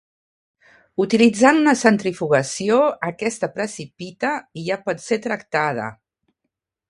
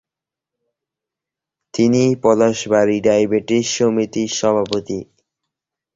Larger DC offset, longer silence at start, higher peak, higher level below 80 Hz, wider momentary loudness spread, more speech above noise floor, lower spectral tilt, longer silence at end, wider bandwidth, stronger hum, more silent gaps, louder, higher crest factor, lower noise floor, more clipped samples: neither; second, 1 s vs 1.75 s; about the same, 0 dBFS vs -2 dBFS; second, -64 dBFS vs -56 dBFS; first, 14 LU vs 8 LU; second, 60 dB vs 71 dB; about the same, -4.5 dB/octave vs -5 dB/octave; about the same, 0.95 s vs 0.9 s; first, 11.5 kHz vs 7.8 kHz; neither; neither; second, -20 LUFS vs -17 LUFS; about the same, 20 dB vs 16 dB; second, -79 dBFS vs -87 dBFS; neither